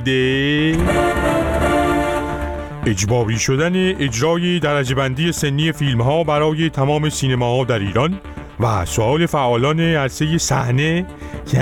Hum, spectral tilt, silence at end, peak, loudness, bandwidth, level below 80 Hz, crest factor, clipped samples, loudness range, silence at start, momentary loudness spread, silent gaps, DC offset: none; -5 dB/octave; 0 s; -4 dBFS; -17 LUFS; 17 kHz; -32 dBFS; 12 dB; under 0.1%; 1 LU; 0 s; 5 LU; none; under 0.1%